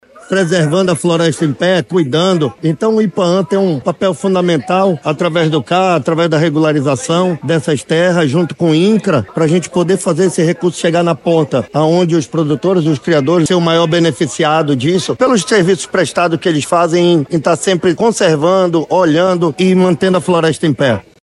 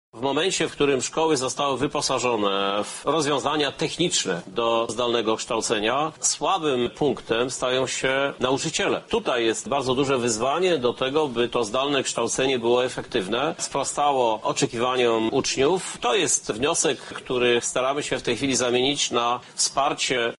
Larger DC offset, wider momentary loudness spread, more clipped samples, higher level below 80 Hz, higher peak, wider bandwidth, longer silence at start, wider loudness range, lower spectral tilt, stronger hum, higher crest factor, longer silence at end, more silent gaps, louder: neither; about the same, 4 LU vs 4 LU; neither; about the same, -54 dBFS vs -56 dBFS; first, 0 dBFS vs -8 dBFS; about the same, 12 kHz vs 11.5 kHz; about the same, 0.15 s vs 0.15 s; about the same, 2 LU vs 1 LU; first, -5.5 dB/octave vs -3 dB/octave; neither; about the same, 12 dB vs 14 dB; first, 0.2 s vs 0.05 s; neither; first, -12 LUFS vs -23 LUFS